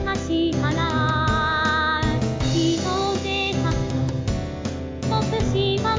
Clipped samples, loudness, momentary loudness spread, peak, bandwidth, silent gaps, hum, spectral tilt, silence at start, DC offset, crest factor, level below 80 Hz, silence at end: under 0.1%; -22 LUFS; 6 LU; -8 dBFS; 7.6 kHz; none; none; -5.5 dB/octave; 0 s; under 0.1%; 14 dB; -34 dBFS; 0 s